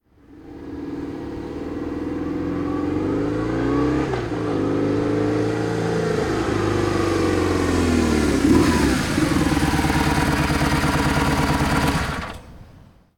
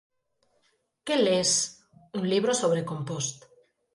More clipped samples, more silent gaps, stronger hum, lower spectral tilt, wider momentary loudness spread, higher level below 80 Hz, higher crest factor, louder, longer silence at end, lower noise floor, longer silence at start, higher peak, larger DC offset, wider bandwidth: neither; neither; neither; first, -6 dB/octave vs -3.5 dB/octave; about the same, 11 LU vs 11 LU; first, -32 dBFS vs -70 dBFS; about the same, 16 dB vs 16 dB; first, -21 LUFS vs -26 LUFS; second, 0.4 s vs 0.55 s; second, -48 dBFS vs -72 dBFS; second, 0.3 s vs 1.05 s; first, -4 dBFS vs -12 dBFS; neither; first, 18.5 kHz vs 11.5 kHz